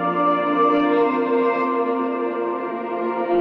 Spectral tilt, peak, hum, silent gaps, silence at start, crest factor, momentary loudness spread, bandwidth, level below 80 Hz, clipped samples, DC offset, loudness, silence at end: -8 dB/octave; -6 dBFS; none; none; 0 s; 14 dB; 7 LU; 5.6 kHz; -66 dBFS; under 0.1%; under 0.1%; -20 LUFS; 0 s